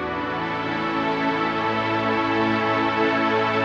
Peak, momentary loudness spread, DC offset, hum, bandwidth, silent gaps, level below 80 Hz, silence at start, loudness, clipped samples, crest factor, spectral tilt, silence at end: -8 dBFS; 5 LU; under 0.1%; none; 8 kHz; none; -54 dBFS; 0 s; -22 LUFS; under 0.1%; 14 dB; -6 dB/octave; 0 s